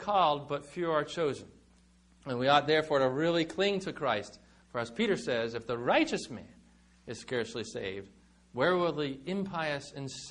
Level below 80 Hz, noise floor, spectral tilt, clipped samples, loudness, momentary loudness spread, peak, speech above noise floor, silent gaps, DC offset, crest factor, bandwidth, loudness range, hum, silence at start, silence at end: -64 dBFS; -63 dBFS; -5 dB/octave; under 0.1%; -31 LUFS; 15 LU; -10 dBFS; 31 dB; none; under 0.1%; 22 dB; 10.5 kHz; 5 LU; none; 0 s; 0 s